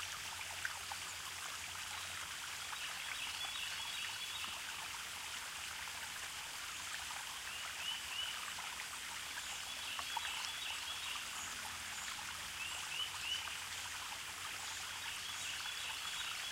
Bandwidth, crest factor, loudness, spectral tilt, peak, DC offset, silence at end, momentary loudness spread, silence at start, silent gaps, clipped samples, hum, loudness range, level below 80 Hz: 16 kHz; 20 dB; -42 LUFS; 1 dB/octave; -24 dBFS; under 0.1%; 0 s; 3 LU; 0 s; none; under 0.1%; none; 1 LU; -70 dBFS